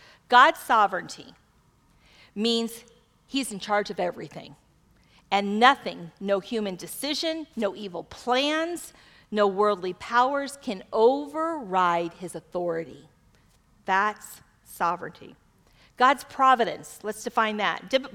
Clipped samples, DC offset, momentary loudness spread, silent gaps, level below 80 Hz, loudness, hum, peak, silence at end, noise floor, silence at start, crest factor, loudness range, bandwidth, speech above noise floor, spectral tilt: under 0.1%; under 0.1%; 17 LU; none; -64 dBFS; -25 LUFS; none; -4 dBFS; 0.05 s; -62 dBFS; 0.3 s; 22 dB; 5 LU; 18 kHz; 37 dB; -3.5 dB/octave